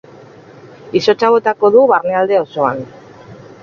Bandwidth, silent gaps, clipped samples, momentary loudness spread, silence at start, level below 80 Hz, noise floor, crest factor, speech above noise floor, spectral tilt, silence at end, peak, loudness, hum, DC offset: 7 kHz; none; under 0.1%; 9 LU; 0.65 s; -58 dBFS; -39 dBFS; 14 dB; 26 dB; -5.5 dB/octave; 0.25 s; 0 dBFS; -13 LUFS; none; under 0.1%